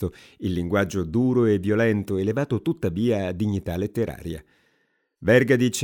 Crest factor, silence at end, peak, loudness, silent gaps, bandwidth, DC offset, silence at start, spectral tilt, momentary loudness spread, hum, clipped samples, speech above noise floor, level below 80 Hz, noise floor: 18 dB; 0 s; -4 dBFS; -23 LUFS; none; 17.5 kHz; under 0.1%; 0 s; -6.5 dB/octave; 10 LU; none; under 0.1%; 47 dB; -52 dBFS; -69 dBFS